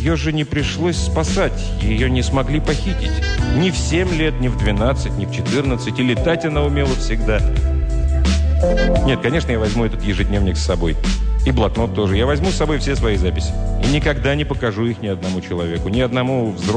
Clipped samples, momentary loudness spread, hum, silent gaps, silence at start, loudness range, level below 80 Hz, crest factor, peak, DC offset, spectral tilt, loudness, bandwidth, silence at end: under 0.1%; 4 LU; none; none; 0 s; 1 LU; -20 dBFS; 12 dB; -6 dBFS; under 0.1%; -6 dB/octave; -18 LUFS; 10 kHz; 0 s